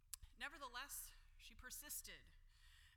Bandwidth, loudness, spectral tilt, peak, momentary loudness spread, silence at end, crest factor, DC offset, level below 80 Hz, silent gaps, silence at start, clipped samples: 19 kHz; -53 LUFS; -0.5 dB/octave; -32 dBFS; 13 LU; 0 s; 26 dB; under 0.1%; -66 dBFS; none; 0 s; under 0.1%